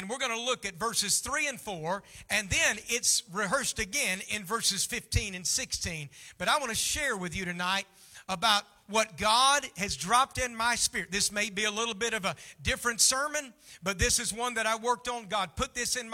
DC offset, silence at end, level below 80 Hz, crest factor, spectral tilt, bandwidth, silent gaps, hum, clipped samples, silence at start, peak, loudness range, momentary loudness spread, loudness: under 0.1%; 0 s; -50 dBFS; 22 dB; -1.5 dB/octave; 17.5 kHz; none; none; under 0.1%; 0 s; -10 dBFS; 3 LU; 10 LU; -29 LUFS